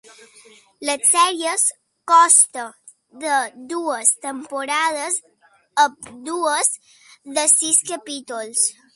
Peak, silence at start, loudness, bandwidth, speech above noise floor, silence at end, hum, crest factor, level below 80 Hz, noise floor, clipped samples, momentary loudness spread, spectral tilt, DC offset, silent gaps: 0 dBFS; 0.8 s; -18 LUFS; 12 kHz; 30 dB; 0.25 s; none; 20 dB; -76 dBFS; -50 dBFS; under 0.1%; 16 LU; 1 dB/octave; under 0.1%; none